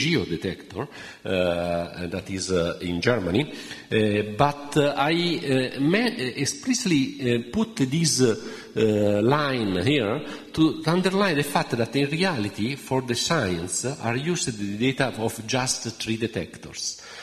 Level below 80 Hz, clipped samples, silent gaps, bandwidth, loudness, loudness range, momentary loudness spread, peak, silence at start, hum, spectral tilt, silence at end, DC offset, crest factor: -54 dBFS; under 0.1%; none; 13.5 kHz; -24 LUFS; 4 LU; 9 LU; -2 dBFS; 0 s; none; -4.5 dB/octave; 0 s; under 0.1%; 22 dB